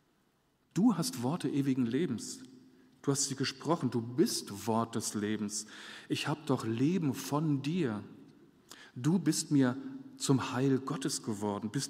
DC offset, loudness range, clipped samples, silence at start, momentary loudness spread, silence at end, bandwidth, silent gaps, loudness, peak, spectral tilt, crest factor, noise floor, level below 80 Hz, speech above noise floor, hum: under 0.1%; 2 LU; under 0.1%; 0.75 s; 10 LU; 0 s; 16 kHz; none; -33 LUFS; -14 dBFS; -5 dB/octave; 18 dB; -73 dBFS; -76 dBFS; 40 dB; none